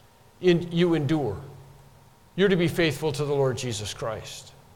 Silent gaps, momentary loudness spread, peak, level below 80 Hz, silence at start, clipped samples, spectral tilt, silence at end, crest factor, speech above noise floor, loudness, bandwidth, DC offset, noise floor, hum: none; 16 LU; -10 dBFS; -52 dBFS; 0.4 s; under 0.1%; -6 dB/octave; 0.25 s; 16 dB; 29 dB; -25 LUFS; 17.5 kHz; under 0.1%; -54 dBFS; none